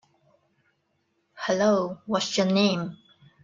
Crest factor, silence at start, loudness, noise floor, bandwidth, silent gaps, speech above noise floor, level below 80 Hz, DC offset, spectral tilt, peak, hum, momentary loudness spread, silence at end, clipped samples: 18 dB; 1.35 s; -25 LUFS; -73 dBFS; 7.6 kHz; none; 49 dB; -70 dBFS; under 0.1%; -5 dB/octave; -10 dBFS; none; 10 LU; 0.5 s; under 0.1%